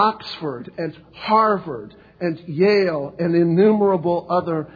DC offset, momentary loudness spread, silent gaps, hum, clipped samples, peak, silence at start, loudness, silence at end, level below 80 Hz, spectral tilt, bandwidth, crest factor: under 0.1%; 14 LU; none; none; under 0.1%; -2 dBFS; 0 s; -20 LUFS; 0.1 s; -58 dBFS; -8.5 dB/octave; 5 kHz; 16 dB